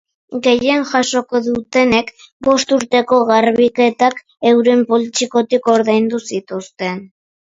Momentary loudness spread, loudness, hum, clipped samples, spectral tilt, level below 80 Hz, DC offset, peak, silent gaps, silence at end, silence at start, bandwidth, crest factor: 11 LU; -15 LUFS; none; under 0.1%; -4 dB/octave; -54 dBFS; under 0.1%; 0 dBFS; 2.32-2.40 s; 0.4 s; 0.3 s; 7.8 kHz; 14 dB